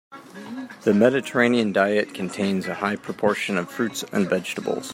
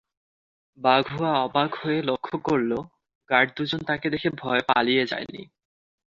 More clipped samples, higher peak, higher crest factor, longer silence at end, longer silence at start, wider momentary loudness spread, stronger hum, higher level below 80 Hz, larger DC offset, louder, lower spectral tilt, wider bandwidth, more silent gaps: neither; about the same, -4 dBFS vs -4 dBFS; about the same, 20 dB vs 22 dB; second, 0 s vs 0.7 s; second, 0.1 s vs 0.8 s; first, 13 LU vs 7 LU; neither; second, -68 dBFS vs -62 dBFS; neither; about the same, -23 LUFS vs -24 LUFS; second, -5 dB/octave vs -6.5 dB/octave; first, 16 kHz vs 7.6 kHz; second, none vs 3.15-3.21 s